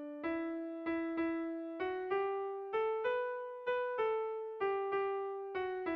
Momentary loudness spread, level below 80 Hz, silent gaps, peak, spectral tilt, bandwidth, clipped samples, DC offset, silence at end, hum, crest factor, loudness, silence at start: 6 LU; -74 dBFS; none; -24 dBFS; -7 dB/octave; 5.4 kHz; under 0.1%; under 0.1%; 0 s; none; 12 dB; -38 LUFS; 0 s